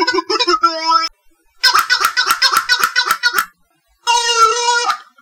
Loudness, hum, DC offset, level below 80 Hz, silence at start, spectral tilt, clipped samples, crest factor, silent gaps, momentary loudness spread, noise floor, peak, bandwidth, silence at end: -13 LUFS; none; under 0.1%; -56 dBFS; 0 s; 1 dB/octave; under 0.1%; 16 dB; none; 7 LU; -59 dBFS; 0 dBFS; 18 kHz; 0.2 s